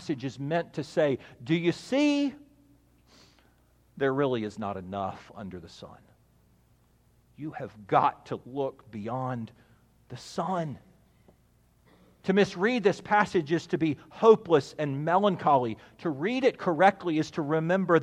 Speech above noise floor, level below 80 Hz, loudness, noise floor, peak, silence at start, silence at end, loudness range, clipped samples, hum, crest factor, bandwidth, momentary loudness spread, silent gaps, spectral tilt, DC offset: 37 dB; -66 dBFS; -28 LUFS; -64 dBFS; -6 dBFS; 0 s; 0 s; 11 LU; under 0.1%; 60 Hz at -65 dBFS; 22 dB; 10.5 kHz; 17 LU; none; -6.5 dB/octave; under 0.1%